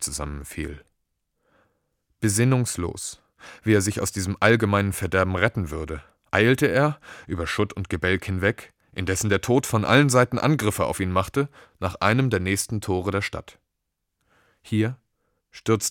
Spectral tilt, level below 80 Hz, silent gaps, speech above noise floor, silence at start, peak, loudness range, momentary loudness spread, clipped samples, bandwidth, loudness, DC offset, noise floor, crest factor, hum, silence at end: -5 dB/octave; -46 dBFS; none; 57 dB; 0 s; -2 dBFS; 6 LU; 14 LU; under 0.1%; 18 kHz; -23 LUFS; under 0.1%; -80 dBFS; 22 dB; none; 0 s